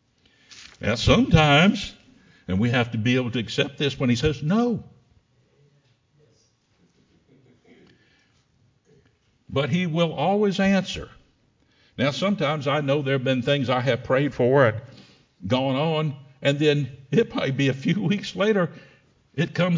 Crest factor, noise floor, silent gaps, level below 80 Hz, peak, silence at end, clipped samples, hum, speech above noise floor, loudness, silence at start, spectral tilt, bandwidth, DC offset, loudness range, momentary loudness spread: 20 dB; -64 dBFS; none; -44 dBFS; -4 dBFS; 0 s; under 0.1%; none; 42 dB; -22 LUFS; 0.5 s; -6 dB/octave; 7.6 kHz; under 0.1%; 7 LU; 12 LU